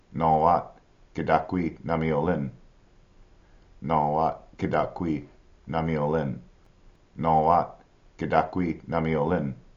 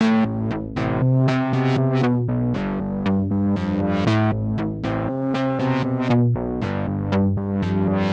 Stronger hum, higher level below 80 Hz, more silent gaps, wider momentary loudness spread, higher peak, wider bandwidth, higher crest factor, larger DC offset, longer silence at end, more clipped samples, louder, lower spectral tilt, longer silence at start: neither; second, -50 dBFS vs -44 dBFS; neither; first, 13 LU vs 6 LU; about the same, -4 dBFS vs -6 dBFS; about the same, 7.2 kHz vs 7.8 kHz; first, 22 dB vs 14 dB; neither; first, 0.2 s vs 0 s; neither; second, -26 LUFS vs -21 LUFS; second, -7 dB/octave vs -8.5 dB/octave; about the same, 0.1 s vs 0 s